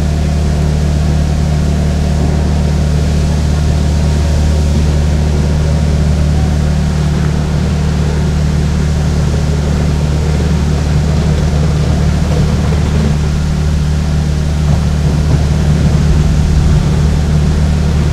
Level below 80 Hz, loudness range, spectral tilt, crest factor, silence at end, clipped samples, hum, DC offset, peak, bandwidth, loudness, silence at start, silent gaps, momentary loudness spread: -16 dBFS; 1 LU; -7 dB/octave; 10 dB; 0 s; under 0.1%; none; under 0.1%; 0 dBFS; 11.5 kHz; -13 LUFS; 0 s; none; 2 LU